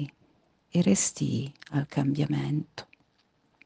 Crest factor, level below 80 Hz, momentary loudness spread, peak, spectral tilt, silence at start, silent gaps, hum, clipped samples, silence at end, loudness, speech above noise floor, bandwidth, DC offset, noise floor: 18 dB; -66 dBFS; 13 LU; -10 dBFS; -5.5 dB/octave; 0 s; none; none; under 0.1%; 0.8 s; -28 LUFS; 42 dB; 10 kHz; under 0.1%; -69 dBFS